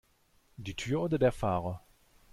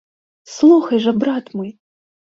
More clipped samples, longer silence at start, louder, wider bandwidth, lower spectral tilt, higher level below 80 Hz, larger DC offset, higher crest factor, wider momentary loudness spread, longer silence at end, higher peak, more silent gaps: neither; about the same, 0.6 s vs 0.5 s; second, -32 LUFS vs -15 LUFS; first, 15.5 kHz vs 7.6 kHz; about the same, -6.5 dB/octave vs -6 dB/octave; first, -54 dBFS vs -64 dBFS; neither; about the same, 18 dB vs 16 dB; about the same, 16 LU vs 18 LU; about the same, 0.55 s vs 0.65 s; second, -14 dBFS vs -2 dBFS; neither